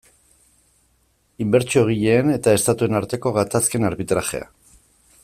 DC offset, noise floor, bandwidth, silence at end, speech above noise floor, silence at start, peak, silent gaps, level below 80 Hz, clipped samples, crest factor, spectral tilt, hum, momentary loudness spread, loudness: under 0.1%; -63 dBFS; 16 kHz; 0.8 s; 44 dB; 1.4 s; -4 dBFS; none; -52 dBFS; under 0.1%; 18 dB; -5 dB/octave; none; 5 LU; -19 LUFS